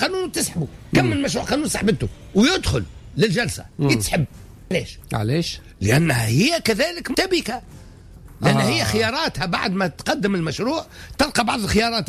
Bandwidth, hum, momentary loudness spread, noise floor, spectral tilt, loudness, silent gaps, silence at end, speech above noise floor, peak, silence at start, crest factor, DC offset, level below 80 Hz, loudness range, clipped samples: 15.5 kHz; none; 8 LU; -42 dBFS; -4.5 dB/octave; -21 LUFS; none; 0 s; 21 dB; -6 dBFS; 0 s; 14 dB; under 0.1%; -40 dBFS; 1 LU; under 0.1%